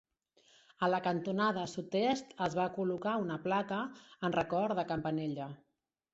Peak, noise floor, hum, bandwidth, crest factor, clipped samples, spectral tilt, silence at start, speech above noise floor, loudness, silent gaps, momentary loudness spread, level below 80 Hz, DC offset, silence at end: -18 dBFS; -69 dBFS; none; 8 kHz; 18 dB; under 0.1%; -4.5 dB/octave; 0.8 s; 35 dB; -35 LUFS; none; 7 LU; -70 dBFS; under 0.1%; 0.55 s